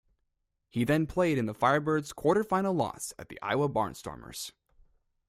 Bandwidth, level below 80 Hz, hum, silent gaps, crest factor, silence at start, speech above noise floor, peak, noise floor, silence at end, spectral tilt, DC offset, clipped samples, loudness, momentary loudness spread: 16 kHz; -58 dBFS; none; none; 20 dB; 0.75 s; 51 dB; -10 dBFS; -80 dBFS; 0.8 s; -5.5 dB/octave; under 0.1%; under 0.1%; -29 LUFS; 13 LU